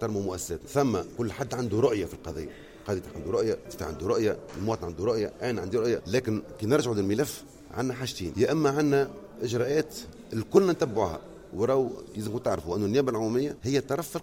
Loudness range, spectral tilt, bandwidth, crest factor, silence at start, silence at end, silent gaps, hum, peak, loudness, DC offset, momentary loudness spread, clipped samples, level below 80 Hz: 3 LU; -6 dB/octave; 16.5 kHz; 22 dB; 0 s; 0 s; none; none; -6 dBFS; -28 LUFS; under 0.1%; 11 LU; under 0.1%; -54 dBFS